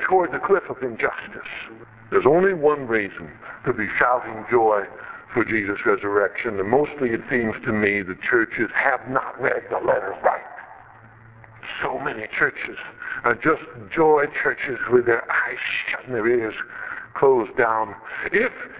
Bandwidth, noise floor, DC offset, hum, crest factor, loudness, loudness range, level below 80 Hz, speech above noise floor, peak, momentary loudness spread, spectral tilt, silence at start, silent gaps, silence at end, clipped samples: 4 kHz; -47 dBFS; under 0.1%; none; 20 dB; -22 LUFS; 4 LU; -56 dBFS; 25 dB; -2 dBFS; 13 LU; -9 dB/octave; 0 s; none; 0 s; under 0.1%